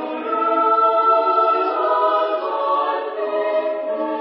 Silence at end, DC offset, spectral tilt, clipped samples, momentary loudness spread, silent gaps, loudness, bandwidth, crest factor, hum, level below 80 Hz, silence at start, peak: 0 s; under 0.1%; -7.5 dB/octave; under 0.1%; 8 LU; none; -18 LUFS; 5.6 kHz; 14 dB; none; -80 dBFS; 0 s; -6 dBFS